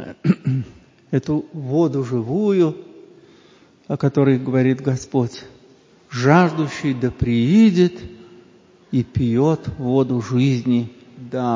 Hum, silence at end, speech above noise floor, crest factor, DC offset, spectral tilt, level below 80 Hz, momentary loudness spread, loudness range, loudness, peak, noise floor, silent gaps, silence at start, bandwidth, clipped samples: none; 0 s; 33 dB; 20 dB; under 0.1%; -8 dB/octave; -46 dBFS; 14 LU; 4 LU; -19 LUFS; 0 dBFS; -51 dBFS; none; 0 s; 7.6 kHz; under 0.1%